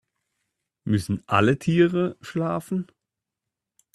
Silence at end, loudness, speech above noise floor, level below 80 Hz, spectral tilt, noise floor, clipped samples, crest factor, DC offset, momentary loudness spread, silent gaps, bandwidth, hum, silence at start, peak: 1.1 s; -24 LUFS; 63 dB; -58 dBFS; -7 dB/octave; -86 dBFS; under 0.1%; 22 dB; under 0.1%; 11 LU; none; 13.5 kHz; none; 0.85 s; -4 dBFS